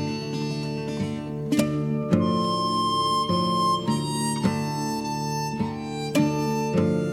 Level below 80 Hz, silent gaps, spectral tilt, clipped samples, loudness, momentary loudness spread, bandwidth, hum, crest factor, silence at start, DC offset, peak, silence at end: -52 dBFS; none; -5.5 dB/octave; under 0.1%; -25 LUFS; 7 LU; 17 kHz; none; 20 dB; 0 s; under 0.1%; -6 dBFS; 0 s